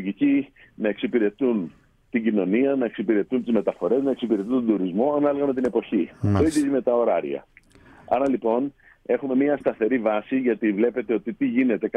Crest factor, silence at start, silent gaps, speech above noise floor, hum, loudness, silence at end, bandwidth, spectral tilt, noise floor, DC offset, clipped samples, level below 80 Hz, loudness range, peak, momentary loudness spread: 14 dB; 0 s; none; 29 dB; none; -23 LUFS; 0.1 s; 11.5 kHz; -7.5 dB/octave; -51 dBFS; under 0.1%; under 0.1%; -56 dBFS; 2 LU; -8 dBFS; 6 LU